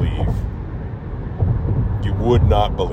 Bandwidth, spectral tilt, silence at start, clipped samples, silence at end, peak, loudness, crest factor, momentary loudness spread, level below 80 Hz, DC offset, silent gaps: 7 kHz; -8.5 dB/octave; 0 s; under 0.1%; 0 s; -4 dBFS; -20 LUFS; 14 dB; 13 LU; -24 dBFS; under 0.1%; none